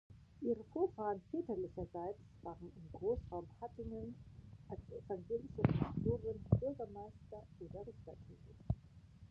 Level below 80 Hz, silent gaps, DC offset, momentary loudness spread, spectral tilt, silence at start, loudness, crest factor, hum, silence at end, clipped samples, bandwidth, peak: -56 dBFS; none; under 0.1%; 19 LU; -10.5 dB/octave; 0.1 s; -43 LUFS; 24 dB; none; 0.05 s; under 0.1%; 6.6 kHz; -18 dBFS